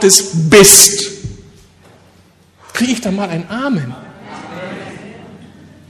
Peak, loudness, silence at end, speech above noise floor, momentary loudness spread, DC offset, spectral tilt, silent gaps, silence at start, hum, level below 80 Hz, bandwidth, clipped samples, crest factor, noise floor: 0 dBFS; -9 LUFS; 0.6 s; 38 dB; 27 LU; under 0.1%; -2.5 dB/octave; none; 0 s; none; -44 dBFS; over 20 kHz; 0.7%; 14 dB; -48 dBFS